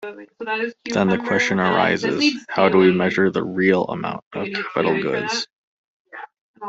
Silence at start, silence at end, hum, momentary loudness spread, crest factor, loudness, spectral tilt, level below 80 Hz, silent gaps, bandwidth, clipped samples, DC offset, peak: 0 s; 0 s; none; 14 LU; 18 dB; -20 LUFS; -5.5 dB/octave; -60 dBFS; 4.22-4.31 s, 5.52-6.05 s, 6.41-6.54 s; 7.8 kHz; under 0.1%; under 0.1%; -2 dBFS